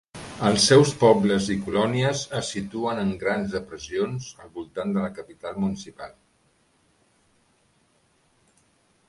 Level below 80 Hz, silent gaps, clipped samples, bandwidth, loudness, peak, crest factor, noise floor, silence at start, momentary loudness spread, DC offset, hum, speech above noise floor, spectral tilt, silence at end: -54 dBFS; none; under 0.1%; 11.5 kHz; -23 LUFS; -2 dBFS; 22 dB; -65 dBFS; 0.15 s; 21 LU; under 0.1%; none; 41 dB; -4.5 dB/octave; 3 s